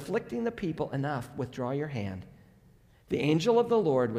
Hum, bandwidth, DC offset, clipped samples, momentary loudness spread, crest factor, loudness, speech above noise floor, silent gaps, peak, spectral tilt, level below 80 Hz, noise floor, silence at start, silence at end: none; 14 kHz; under 0.1%; under 0.1%; 12 LU; 16 dB; -30 LUFS; 31 dB; none; -14 dBFS; -7 dB/octave; -60 dBFS; -60 dBFS; 0 s; 0 s